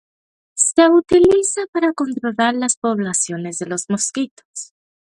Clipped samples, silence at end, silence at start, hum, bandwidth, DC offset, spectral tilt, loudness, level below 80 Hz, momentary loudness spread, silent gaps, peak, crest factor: under 0.1%; 0.4 s; 0.55 s; none; 11.5 kHz; under 0.1%; -3.5 dB/octave; -17 LUFS; -52 dBFS; 17 LU; 1.68-1.73 s, 2.77-2.82 s, 4.31-4.37 s, 4.45-4.54 s; 0 dBFS; 18 dB